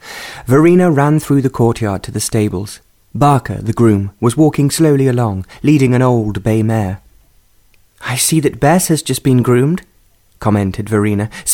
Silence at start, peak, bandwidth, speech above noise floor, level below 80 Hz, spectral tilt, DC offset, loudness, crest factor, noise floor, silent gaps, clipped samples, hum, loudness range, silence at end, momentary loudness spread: 0.05 s; 0 dBFS; 18.5 kHz; 39 dB; -40 dBFS; -6 dB/octave; under 0.1%; -13 LUFS; 12 dB; -51 dBFS; none; under 0.1%; none; 2 LU; 0 s; 10 LU